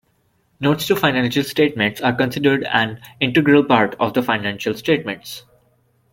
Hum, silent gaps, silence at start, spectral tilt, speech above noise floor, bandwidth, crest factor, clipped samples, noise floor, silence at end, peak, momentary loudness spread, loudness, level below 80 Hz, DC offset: none; none; 0.6 s; -5.5 dB/octave; 45 dB; 17 kHz; 18 dB; under 0.1%; -63 dBFS; 0.75 s; -2 dBFS; 9 LU; -18 LUFS; -56 dBFS; under 0.1%